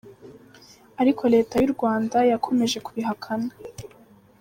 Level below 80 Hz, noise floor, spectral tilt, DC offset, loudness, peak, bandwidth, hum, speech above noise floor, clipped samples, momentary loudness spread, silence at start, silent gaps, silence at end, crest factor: -58 dBFS; -53 dBFS; -5 dB/octave; under 0.1%; -23 LUFS; -8 dBFS; 16.5 kHz; none; 31 dB; under 0.1%; 20 LU; 0.05 s; none; 0.55 s; 16 dB